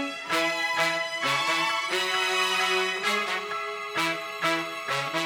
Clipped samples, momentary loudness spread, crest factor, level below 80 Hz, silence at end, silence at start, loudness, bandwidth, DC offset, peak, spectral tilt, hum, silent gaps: under 0.1%; 6 LU; 16 dB; -76 dBFS; 0 s; 0 s; -25 LUFS; over 20 kHz; under 0.1%; -10 dBFS; -1.5 dB/octave; none; none